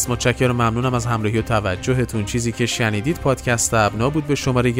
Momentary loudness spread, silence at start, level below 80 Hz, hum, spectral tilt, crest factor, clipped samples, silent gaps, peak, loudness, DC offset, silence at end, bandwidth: 3 LU; 0 s; -38 dBFS; none; -5 dB/octave; 16 dB; under 0.1%; none; -2 dBFS; -19 LUFS; under 0.1%; 0 s; 16 kHz